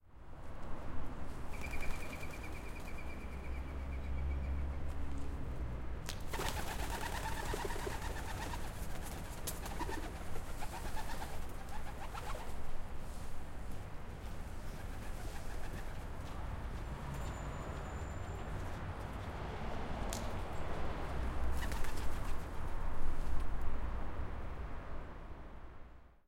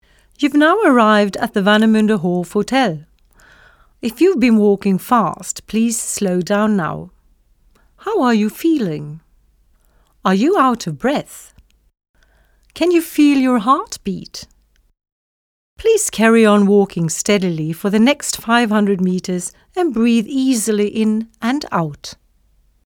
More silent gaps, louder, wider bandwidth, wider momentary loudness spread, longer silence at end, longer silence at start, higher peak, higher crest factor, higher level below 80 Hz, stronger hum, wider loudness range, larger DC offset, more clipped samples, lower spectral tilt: second, none vs 12.09-12.14 s, 15.12-15.76 s; second, -44 LUFS vs -16 LUFS; second, 16.5 kHz vs 18.5 kHz; second, 8 LU vs 13 LU; second, 0.2 s vs 0.7 s; second, 0.05 s vs 0.4 s; second, -20 dBFS vs 0 dBFS; about the same, 16 dB vs 16 dB; first, -42 dBFS vs -52 dBFS; neither; about the same, 5 LU vs 5 LU; neither; neither; about the same, -5 dB/octave vs -5 dB/octave